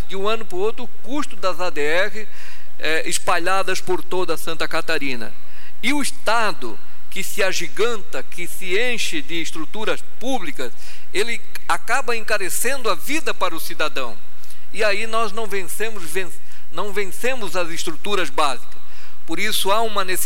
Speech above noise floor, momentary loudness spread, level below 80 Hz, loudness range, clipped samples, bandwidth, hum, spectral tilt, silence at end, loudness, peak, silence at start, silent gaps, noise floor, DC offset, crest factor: 23 dB; 12 LU; -52 dBFS; 3 LU; under 0.1%; 16.5 kHz; none; -3 dB/octave; 0 s; -23 LUFS; -2 dBFS; 0 s; none; -47 dBFS; 20%; 20 dB